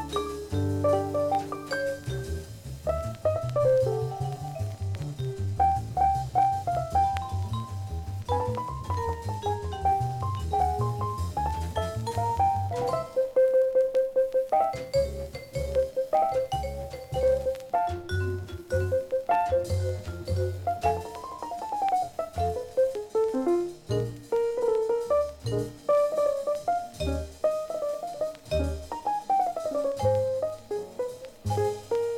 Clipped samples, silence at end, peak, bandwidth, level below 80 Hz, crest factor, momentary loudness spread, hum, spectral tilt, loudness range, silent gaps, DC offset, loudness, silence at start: under 0.1%; 0 s; -14 dBFS; 16.5 kHz; -44 dBFS; 14 dB; 9 LU; none; -6.5 dB/octave; 4 LU; none; under 0.1%; -28 LUFS; 0 s